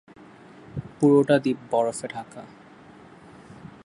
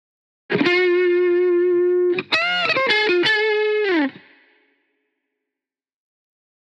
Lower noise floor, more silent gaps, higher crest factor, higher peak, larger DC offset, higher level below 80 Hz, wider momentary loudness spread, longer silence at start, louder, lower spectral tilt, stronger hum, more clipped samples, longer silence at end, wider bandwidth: second, -48 dBFS vs -89 dBFS; neither; about the same, 20 dB vs 16 dB; about the same, -6 dBFS vs -6 dBFS; neither; first, -62 dBFS vs -76 dBFS; first, 25 LU vs 4 LU; first, 0.75 s vs 0.5 s; second, -22 LUFS vs -18 LUFS; first, -6.5 dB/octave vs -5 dB/octave; neither; neither; second, 0.2 s vs 2.55 s; first, 11.5 kHz vs 7.6 kHz